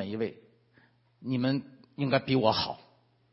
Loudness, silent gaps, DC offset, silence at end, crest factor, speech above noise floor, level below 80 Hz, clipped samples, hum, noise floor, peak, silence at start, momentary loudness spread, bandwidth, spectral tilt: -30 LUFS; none; under 0.1%; 0.55 s; 22 dB; 36 dB; -66 dBFS; under 0.1%; none; -64 dBFS; -10 dBFS; 0 s; 17 LU; 6 kHz; -8.5 dB/octave